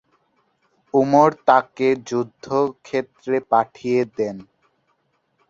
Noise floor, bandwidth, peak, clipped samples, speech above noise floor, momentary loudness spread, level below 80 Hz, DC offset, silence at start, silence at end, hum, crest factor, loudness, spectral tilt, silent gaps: -68 dBFS; 7.6 kHz; -2 dBFS; under 0.1%; 48 dB; 11 LU; -64 dBFS; under 0.1%; 0.95 s; 1.1 s; none; 20 dB; -20 LUFS; -6.5 dB/octave; none